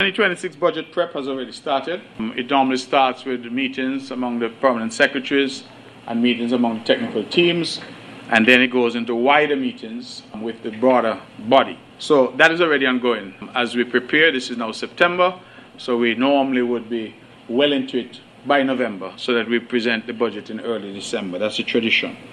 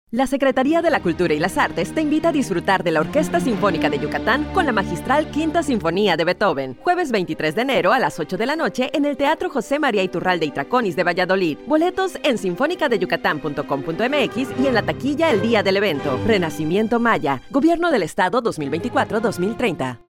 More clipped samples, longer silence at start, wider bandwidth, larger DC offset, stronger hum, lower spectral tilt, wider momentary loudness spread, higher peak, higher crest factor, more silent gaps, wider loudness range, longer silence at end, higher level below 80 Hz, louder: neither; about the same, 0 s vs 0.1 s; second, 11 kHz vs 16.5 kHz; neither; neither; about the same, -4.5 dB/octave vs -5.5 dB/octave; first, 13 LU vs 4 LU; first, 0 dBFS vs -4 dBFS; first, 20 dB vs 14 dB; neither; first, 4 LU vs 1 LU; second, 0 s vs 0.15 s; second, -66 dBFS vs -46 dBFS; about the same, -19 LUFS vs -20 LUFS